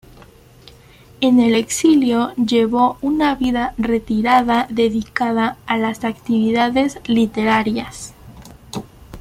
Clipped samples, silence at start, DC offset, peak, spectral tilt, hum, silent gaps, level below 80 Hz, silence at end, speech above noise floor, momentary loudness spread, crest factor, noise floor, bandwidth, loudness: under 0.1%; 1.2 s; under 0.1%; -2 dBFS; -4.5 dB/octave; none; none; -44 dBFS; 0 s; 28 dB; 11 LU; 16 dB; -45 dBFS; 15 kHz; -17 LUFS